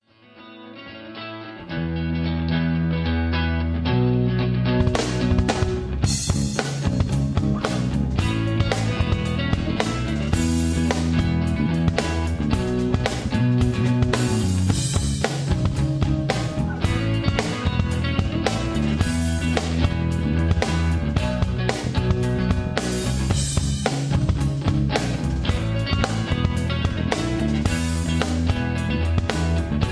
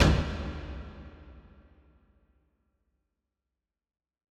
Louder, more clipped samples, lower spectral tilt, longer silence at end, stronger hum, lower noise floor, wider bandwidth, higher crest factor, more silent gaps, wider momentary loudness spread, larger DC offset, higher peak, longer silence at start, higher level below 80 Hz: first, -23 LUFS vs -32 LUFS; neither; about the same, -6 dB/octave vs -6 dB/octave; second, 0 s vs 2.9 s; neither; second, -47 dBFS vs -88 dBFS; about the same, 11 kHz vs 12 kHz; about the same, 20 dB vs 24 dB; neither; second, 3 LU vs 25 LU; neither; first, -2 dBFS vs -8 dBFS; first, 0.35 s vs 0 s; first, -30 dBFS vs -38 dBFS